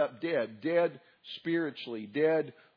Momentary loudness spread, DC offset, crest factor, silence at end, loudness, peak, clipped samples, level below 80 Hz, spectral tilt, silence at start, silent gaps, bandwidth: 12 LU; under 0.1%; 16 dB; 0.25 s; -32 LUFS; -16 dBFS; under 0.1%; -88 dBFS; -4 dB/octave; 0 s; none; 5.2 kHz